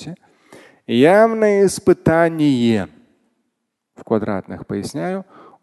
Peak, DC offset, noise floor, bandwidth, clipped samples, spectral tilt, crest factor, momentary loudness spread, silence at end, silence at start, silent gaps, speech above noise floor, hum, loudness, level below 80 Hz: 0 dBFS; under 0.1%; -74 dBFS; 12.5 kHz; under 0.1%; -6 dB/octave; 18 dB; 14 LU; 0.4 s; 0 s; none; 58 dB; none; -17 LUFS; -48 dBFS